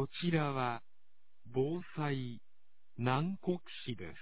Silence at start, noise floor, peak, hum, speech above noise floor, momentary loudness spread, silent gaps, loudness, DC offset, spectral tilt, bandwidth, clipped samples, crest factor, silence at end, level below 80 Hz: 0 s; -84 dBFS; -18 dBFS; none; 48 dB; 12 LU; none; -37 LUFS; 0.4%; -5.5 dB/octave; 4 kHz; under 0.1%; 20 dB; 0 s; -68 dBFS